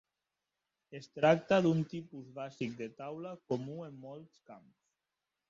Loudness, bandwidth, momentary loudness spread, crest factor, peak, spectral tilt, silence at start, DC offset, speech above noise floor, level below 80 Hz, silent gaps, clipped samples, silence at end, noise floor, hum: -34 LUFS; 7.6 kHz; 21 LU; 24 dB; -12 dBFS; -7 dB/octave; 0.9 s; under 0.1%; 54 dB; -74 dBFS; none; under 0.1%; 0.9 s; -89 dBFS; none